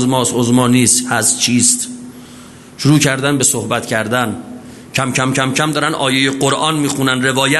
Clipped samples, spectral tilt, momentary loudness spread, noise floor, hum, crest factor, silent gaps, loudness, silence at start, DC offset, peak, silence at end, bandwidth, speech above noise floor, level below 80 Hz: under 0.1%; -3.5 dB/octave; 11 LU; -36 dBFS; none; 14 dB; none; -13 LUFS; 0 s; under 0.1%; 0 dBFS; 0 s; 12.5 kHz; 23 dB; -52 dBFS